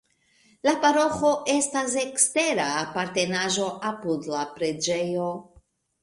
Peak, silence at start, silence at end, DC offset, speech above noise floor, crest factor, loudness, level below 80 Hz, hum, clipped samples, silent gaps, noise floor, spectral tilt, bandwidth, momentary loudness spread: -6 dBFS; 0.65 s; 0.6 s; under 0.1%; 38 dB; 20 dB; -24 LUFS; -64 dBFS; none; under 0.1%; none; -62 dBFS; -2.5 dB/octave; 11.5 kHz; 9 LU